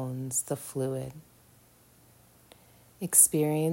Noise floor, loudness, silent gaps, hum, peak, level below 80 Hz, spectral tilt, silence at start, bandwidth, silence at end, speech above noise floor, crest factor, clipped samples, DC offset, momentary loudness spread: -60 dBFS; -25 LUFS; none; none; -4 dBFS; -68 dBFS; -4.5 dB/octave; 0 s; 16.5 kHz; 0 s; 32 dB; 28 dB; under 0.1%; under 0.1%; 19 LU